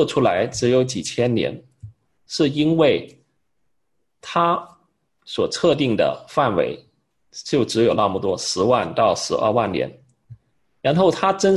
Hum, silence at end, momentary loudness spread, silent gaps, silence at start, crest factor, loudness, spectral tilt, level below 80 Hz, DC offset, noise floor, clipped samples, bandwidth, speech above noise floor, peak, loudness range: none; 0 s; 9 LU; none; 0 s; 18 dB; -20 LUFS; -5 dB/octave; -52 dBFS; under 0.1%; -75 dBFS; under 0.1%; 12 kHz; 56 dB; -4 dBFS; 2 LU